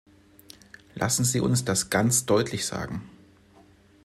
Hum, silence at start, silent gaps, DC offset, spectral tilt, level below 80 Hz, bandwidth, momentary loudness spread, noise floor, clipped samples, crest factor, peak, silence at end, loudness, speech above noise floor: none; 0.95 s; none; under 0.1%; -4 dB/octave; -56 dBFS; 15.5 kHz; 13 LU; -56 dBFS; under 0.1%; 20 dB; -8 dBFS; 0.95 s; -25 LUFS; 31 dB